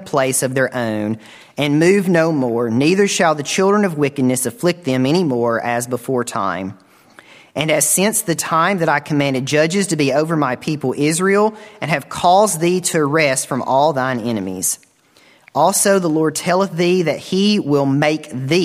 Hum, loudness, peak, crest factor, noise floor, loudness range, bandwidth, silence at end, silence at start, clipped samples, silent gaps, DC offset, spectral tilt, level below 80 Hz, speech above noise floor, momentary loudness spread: none; -16 LUFS; 0 dBFS; 16 dB; -51 dBFS; 3 LU; 16 kHz; 0 s; 0 s; under 0.1%; none; under 0.1%; -4.5 dB/octave; -60 dBFS; 35 dB; 8 LU